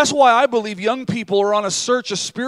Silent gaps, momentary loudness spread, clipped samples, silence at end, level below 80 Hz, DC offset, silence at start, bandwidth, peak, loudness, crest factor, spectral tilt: none; 9 LU; under 0.1%; 0 s; -64 dBFS; under 0.1%; 0 s; 13 kHz; -2 dBFS; -17 LUFS; 16 dB; -3 dB/octave